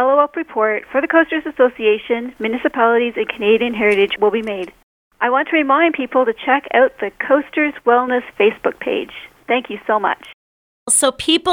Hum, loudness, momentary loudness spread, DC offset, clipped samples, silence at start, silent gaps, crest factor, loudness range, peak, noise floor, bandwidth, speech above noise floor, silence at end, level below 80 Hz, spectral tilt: none; -17 LUFS; 8 LU; under 0.1%; under 0.1%; 0 s; 4.83-5.11 s, 10.34-10.86 s; 16 dB; 3 LU; 0 dBFS; under -90 dBFS; 16.5 kHz; over 73 dB; 0 s; -56 dBFS; -2.5 dB/octave